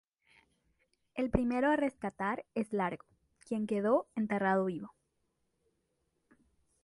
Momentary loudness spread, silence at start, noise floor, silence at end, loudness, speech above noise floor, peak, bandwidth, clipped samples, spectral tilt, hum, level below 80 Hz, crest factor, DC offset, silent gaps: 11 LU; 1.15 s; -80 dBFS; 1.95 s; -33 LUFS; 47 dB; -14 dBFS; 11.5 kHz; under 0.1%; -7.5 dB/octave; none; -56 dBFS; 22 dB; under 0.1%; none